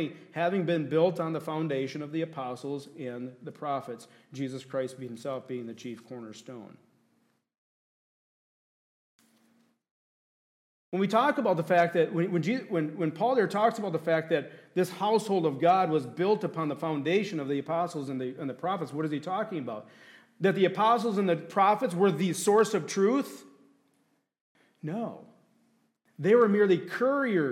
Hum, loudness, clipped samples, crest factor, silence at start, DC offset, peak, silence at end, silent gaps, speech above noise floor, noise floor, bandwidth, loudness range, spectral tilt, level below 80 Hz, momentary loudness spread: none; -28 LUFS; under 0.1%; 18 dB; 0 s; under 0.1%; -12 dBFS; 0 s; 7.58-9.19 s, 9.91-10.92 s, 24.41-24.55 s; 44 dB; -72 dBFS; 15.5 kHz; 12 LU; -6 dB/octave; -84 dBFS; 15 LU